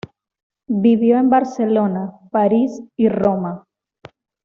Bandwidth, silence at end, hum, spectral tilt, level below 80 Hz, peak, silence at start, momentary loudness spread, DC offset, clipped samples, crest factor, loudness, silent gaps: 7 kHz; 0.85 s; none; -8.5 dB/octave; -56 dBFS; -4 dBFS; 0.7 s; 10 LU; under 0.1%; under 0.1%; 14 dB; -17 LUFS; none